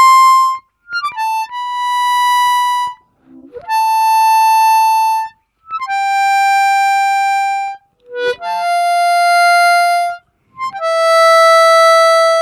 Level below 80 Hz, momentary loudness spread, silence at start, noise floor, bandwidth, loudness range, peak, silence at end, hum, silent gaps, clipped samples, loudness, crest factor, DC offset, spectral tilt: -66 dBFS; 15 LU; 0 s; -43 dBFS; 16.5 kHz; 5 LU; -2 dBFS; 0 s; none; none; under 0.1%; -12 LUFS; 10 dB; under 0.1%; 1.5 dB/octave